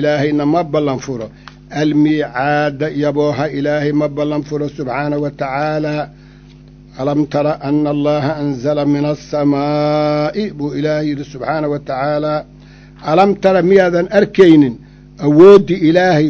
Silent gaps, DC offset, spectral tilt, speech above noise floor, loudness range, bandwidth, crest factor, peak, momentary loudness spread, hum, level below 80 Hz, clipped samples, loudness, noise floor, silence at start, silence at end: none; under 0.1%; -7.5 dB/octave; 26 dB; 8 LU; 7.2 kHz; 14 dB; 0 dBFS; 12 LU; 50 Hz at -40 dBFS; -44 dBFS; 0.6%; -14 LUFS; -39 dBFS; 0 s; 0 s